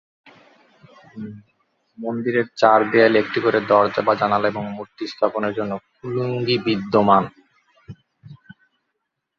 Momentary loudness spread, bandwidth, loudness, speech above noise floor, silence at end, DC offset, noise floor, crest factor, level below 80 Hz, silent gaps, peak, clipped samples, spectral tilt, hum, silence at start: 16 LU; 7.6 kHz; -19 LUFS; 58 dB; 1.05 s; under 0.1%; -77 dBFS; 20 dB; -60 dBFS; none; 0 dBFS; under 0.1%; -7 dB/octave; none; 1.15 s